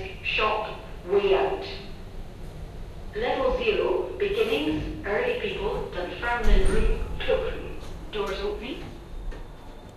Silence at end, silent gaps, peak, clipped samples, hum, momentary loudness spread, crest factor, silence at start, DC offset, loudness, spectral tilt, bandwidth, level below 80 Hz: 0 s; none; -8 dBFS; under 0.1%; none; 18 LU; 20 dB; 0 s; under 0.1%; -27 LUFS; -5.5 dB/octave; 13 kHz; -32 dBFS